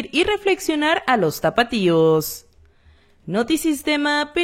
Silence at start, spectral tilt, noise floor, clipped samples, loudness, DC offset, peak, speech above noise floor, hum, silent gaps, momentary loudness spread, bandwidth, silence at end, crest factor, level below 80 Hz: 0 s; -4.5 dB/octave; -53 dBFS; under 0.1%; -19 LUFS; under 0.1%; -2 dBFS; 34 dB; none; none; 6 LU; 16.5 kHz; 0 s; 18 dB; -50 dBFS